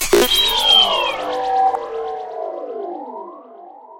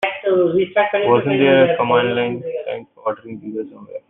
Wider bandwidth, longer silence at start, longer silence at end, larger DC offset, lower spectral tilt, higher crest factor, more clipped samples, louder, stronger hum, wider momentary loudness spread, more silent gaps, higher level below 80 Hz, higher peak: first, 16.5 kHz vs 4 kHz; about the same, 0 s vs 0 s; about the same, 0 s vs 0.1 s; neither; second, -1 dB/octave vs -8.5 dB/octave; about the same, 18 dB vs 16 dB; neither; about the same, -15 LUFS vs -17 LUFS; neither; first, 20 LU vs 15 LU; neither; first, -40 dBFS vs -62 dBFS; about the same, -2 dBFS vs -2 dBFS